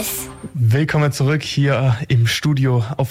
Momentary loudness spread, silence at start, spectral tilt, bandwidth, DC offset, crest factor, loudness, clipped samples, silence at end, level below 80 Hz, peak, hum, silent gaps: 5 LU; 0 s; -5.5 dB/octave; 16 kHz; under 0.1%; 10 dB; -18 LUFS; under 0.1%; 0 s; -46 dBFS; -8 dBFS; none; none